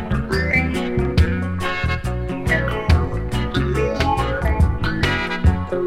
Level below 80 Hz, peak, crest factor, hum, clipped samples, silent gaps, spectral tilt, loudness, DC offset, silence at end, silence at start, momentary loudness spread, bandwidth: -26 dBFS; -2 dBFS; 16 dB; none; under 0.1%; none; -6.5 dB/octave; -20 LUFS; under 0.1%; 0 s; 0 s; 4 LU; 13 kHz